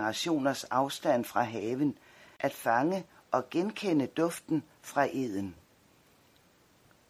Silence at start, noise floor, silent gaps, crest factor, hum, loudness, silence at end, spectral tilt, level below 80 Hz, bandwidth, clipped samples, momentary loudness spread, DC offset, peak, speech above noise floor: 0 s; -64 dBFS; none; 20 dB; none; -31 LUFS; 1.55 s; -5 dB/octave; -74 dBFS; 16 kHz; under 0.1%; 7 LU; under 0.1%; -12 dBFS; 33 dB